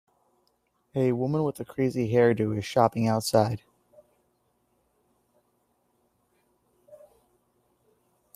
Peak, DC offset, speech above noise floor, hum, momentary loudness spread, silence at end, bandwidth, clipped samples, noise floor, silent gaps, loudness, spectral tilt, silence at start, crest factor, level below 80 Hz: -6 dBFS; under 0.1%; 47 dB; 60 Hz at -50 dBFS; 7 LU; 1.4 s; 15.5 kHz; under 0.1%; -72 dBFS; none; -26 LUFS; -6.5 dB/octave; 0.95 s; 24 dB; -64 dBFS